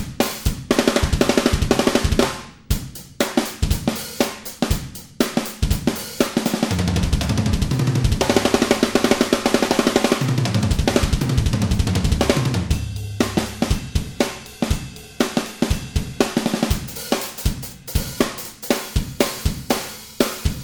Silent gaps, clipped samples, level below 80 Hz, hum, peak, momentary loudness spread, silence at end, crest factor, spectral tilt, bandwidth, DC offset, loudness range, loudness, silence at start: none; under 0.1%; -28 dBFS; none; 0 dBFS; 8 LU; 0 s; 20 dB; -5 dB/octave; over 20 kHz; under 0.1%; 5 LU; -21 LUFS; 0 s